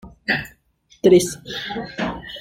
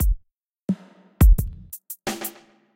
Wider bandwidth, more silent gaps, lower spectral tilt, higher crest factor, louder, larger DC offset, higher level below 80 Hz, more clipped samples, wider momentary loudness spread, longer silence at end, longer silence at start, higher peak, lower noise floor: about the same, 15.5 kHz vs 17 kHz; neither; second, -4.5 dB/octave vs -6 dB/octave; about the same, 18 dB vs 18 dB; first, -20 LUFS vs -24 LUFS; neither; second, -48 dBFS vs -24 dBFS; neither; second, 14 LU vs 17 LU; second, 0 s vs 0.45 s; about the same, 0.05 s vs 0 s; about the same, -2 dBFS vs -4 dBFS; second, -57 dBFS vs -62 dBFS